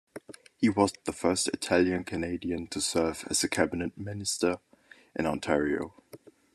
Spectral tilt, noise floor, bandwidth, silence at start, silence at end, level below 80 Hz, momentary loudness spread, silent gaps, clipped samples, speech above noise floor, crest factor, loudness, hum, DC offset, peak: -4 dB/octave; -53 dBFS; 13.5 kHz; 0.15 s; 0.4 s; -60 dBFS; 10 LU; none; under 0.1%; 24 dB; 22 dB; -29 LUFS; none; under 0.1%; -8 dBFS